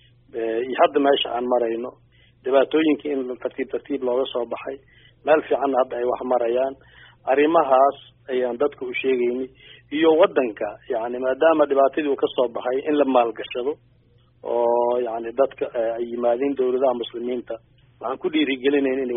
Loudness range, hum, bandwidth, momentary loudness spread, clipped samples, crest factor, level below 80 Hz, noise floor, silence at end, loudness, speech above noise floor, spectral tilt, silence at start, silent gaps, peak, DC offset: 3 LU; none; 3.8 kHz; 13 LU; under 0.1%; 18 dB; -62 dBFS; -57 dBFS; 0 s; -22 LUFS; 36 dB; -2.5 dB/octave; 0.35 s; none; -4 dBFS; under 0.1%